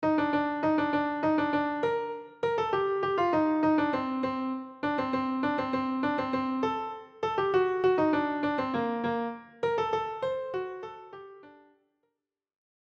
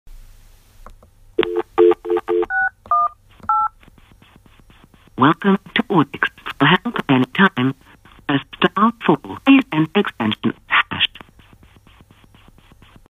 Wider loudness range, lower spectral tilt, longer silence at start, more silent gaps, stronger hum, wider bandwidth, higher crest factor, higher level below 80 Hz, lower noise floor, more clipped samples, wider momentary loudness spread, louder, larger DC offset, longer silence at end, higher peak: about the same, 6 LU vs 4 LU; about the same, -7 dB/octave vs -7 dB/octave; about the same, 0 s vs 0.05 s; neither; neither; second, 7 kHz vs 9.6 kHz; second, 14 dB vs 20 dB; second, -64 dBFS vs -50 dBFS; first, -84 dBFS vs -49 dBFS; neither; about the same, 9 LU vs 8 LU; second, -29 LUFS vs -18 LUFS; neither; second, 1.4 s vs 2.05 s; second, -16 dBFS vs 0 dBFS